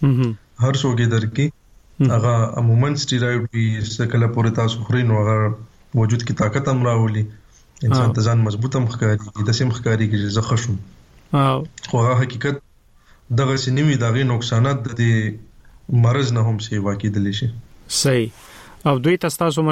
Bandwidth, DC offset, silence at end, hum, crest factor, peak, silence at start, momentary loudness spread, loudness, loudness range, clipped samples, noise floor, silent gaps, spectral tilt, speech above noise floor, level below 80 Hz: 13.5 kHz; under 0.1%; 0 s; none; 14 dB; -4 dBFS; 0 s; 7 LU; -19 LUFS; 2 LU; under 0.1%; -51 dBFS; none; -6 dB/octave; 33 dB; -48 dBFS